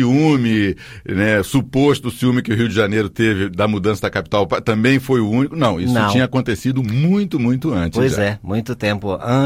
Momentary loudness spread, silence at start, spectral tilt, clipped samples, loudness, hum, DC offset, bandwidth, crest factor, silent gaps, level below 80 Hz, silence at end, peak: 5 LU; 0 s; -6.5 dB/octave; under 0.1%; -17 LUFS; none; under 0.1%; 16 kHz; 14 dB; none; -42 dBFS; 0 s; -2 dBFS